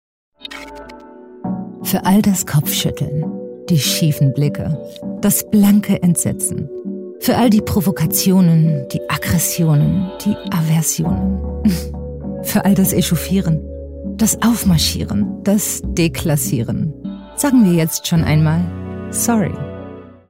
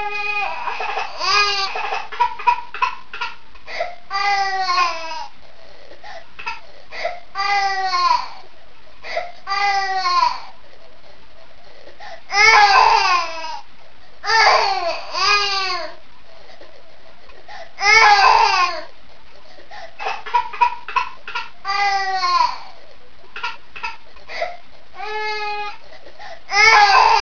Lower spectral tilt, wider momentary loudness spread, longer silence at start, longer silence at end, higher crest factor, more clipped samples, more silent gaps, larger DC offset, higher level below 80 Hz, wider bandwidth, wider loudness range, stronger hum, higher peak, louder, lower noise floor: first, -5 dB/octave vs 0 dB/octave; second, 15 LU vs 23 LU; first, 0.4 s vs 0 s; first, 0.15 s vs 0 s; second, 12 dB vs 20 dB; neither; neither; second, under 0.1% vs 4%; first, -36 dBFS vs -52 dBFS; first, 16.5 kHz vs 5.4 kHz; second, 3 LU vs 8 LU; neither; second, -4 dBFS vs 0 dBFS; about the same, -16 LUFS vs -17 LUFS; second, -38 dBFS vs -48 dBFS